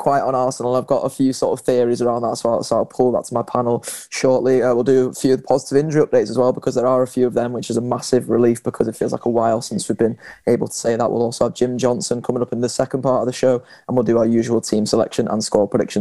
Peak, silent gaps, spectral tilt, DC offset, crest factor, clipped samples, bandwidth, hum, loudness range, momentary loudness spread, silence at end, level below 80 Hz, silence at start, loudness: 0 dBFS; none; -5.5 dB/octave; 0.3%; 18 dB; under 0.1%; 12.5 kHz; none; 2 LU; 5 LU; 0 s; -56 dBFS; 0 s; -19 LUFS